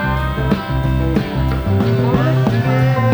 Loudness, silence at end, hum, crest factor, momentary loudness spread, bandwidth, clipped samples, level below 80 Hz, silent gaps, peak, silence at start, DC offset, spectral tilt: -16 LUFS; 0 s; none; 12 dB; 4 LU; over 20 kHz; under 0.1%; -26 dBFS; none; -2 dBFS; 0 s; under 0.1%; -8 dB/octave